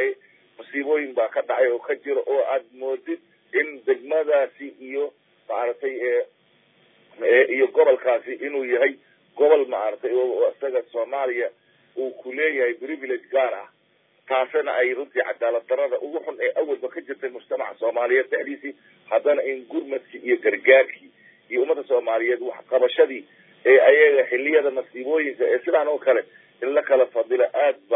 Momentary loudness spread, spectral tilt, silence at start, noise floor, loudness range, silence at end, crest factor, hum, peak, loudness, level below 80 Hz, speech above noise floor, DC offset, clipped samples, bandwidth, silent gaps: 13 LU; -7 dB/octave; 0 s; -63 dBFS; 7 LU; 0 s; 20 dB; none; -2 dBFS; -22 LUFS; under -90 dBFS; 41 dB; under 0.1%; under 0.1%; 3.9 kHz; none